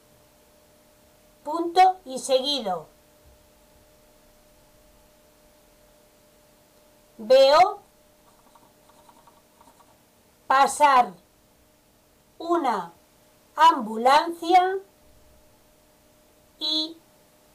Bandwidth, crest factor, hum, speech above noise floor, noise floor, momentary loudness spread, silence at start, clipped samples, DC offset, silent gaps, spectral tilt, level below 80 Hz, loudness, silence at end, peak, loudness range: 15.5 kHz; 16 dB; none; 39 dB; -60 dBFS; 16 LU; 1.45 s; under 0.1%; under 0.1%; none; -2.5 dB/octave; -64 dBFS; -21 LUFS; 0.6 s; -10 dBFS; 5 LU